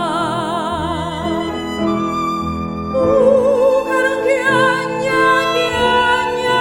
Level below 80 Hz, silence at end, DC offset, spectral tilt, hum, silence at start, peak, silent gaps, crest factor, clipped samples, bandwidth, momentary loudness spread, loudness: -40 dBFS; 0 s; under 0.1%; -5 dB/octave; none; 0 s; -2 dBFS; none; 14 dB; under 0.1%; 17.5 kHz; 8 LU; -16 LUFS